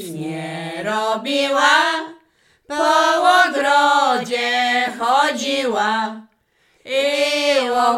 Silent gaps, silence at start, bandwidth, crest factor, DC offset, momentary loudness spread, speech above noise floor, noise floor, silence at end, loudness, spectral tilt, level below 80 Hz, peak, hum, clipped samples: none; 0 s; 16.5 kHz; 16 dB; under 0.1%; 13 LU; 43 dB; -61 dBFS; 0 s; -17 LUFS; -2.5 dB/octave; -66 dBFS; -2 dBFS; none; under 0.1%